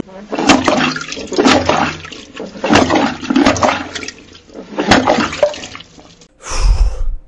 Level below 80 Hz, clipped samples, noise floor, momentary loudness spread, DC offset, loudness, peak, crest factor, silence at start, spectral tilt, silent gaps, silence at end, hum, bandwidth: -22 dBFS; under 0.1%; -42 dBFS; 18 LU; under 0.1%; -14 LUFS; 0 dBFS; 14 dB; 0.05 s; -4 dB/octave; none; 0.05 s; none; 11 kHz